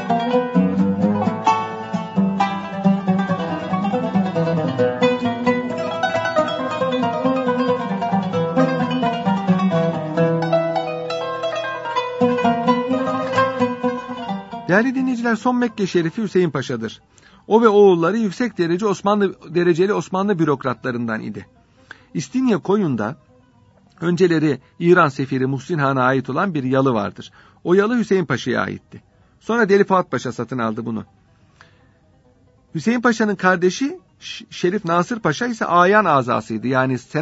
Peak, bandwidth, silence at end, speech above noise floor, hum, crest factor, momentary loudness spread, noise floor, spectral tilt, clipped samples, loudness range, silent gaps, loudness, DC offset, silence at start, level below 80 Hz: 0 dBFS; 8 kHz; 0 s; 36 dB; none; 20 dB; 9 LU; -54 dBFS; -6.5 dB/octave; under 0.1%; 4 LU; none; -19 LUFS; under 0.1%; 0 s; -60 dBFS